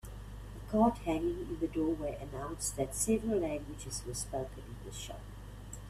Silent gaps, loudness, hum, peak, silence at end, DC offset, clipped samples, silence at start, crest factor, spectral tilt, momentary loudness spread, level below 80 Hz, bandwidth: none; -35 LUFS; 50 Hz at -45 dBFS; -16 dBFS; 0 s; under 0.1%; under 0.1%; 0.05 s; 20 dB; -5 dB/octave; 18 LU; -48 dBFS; 15 kHz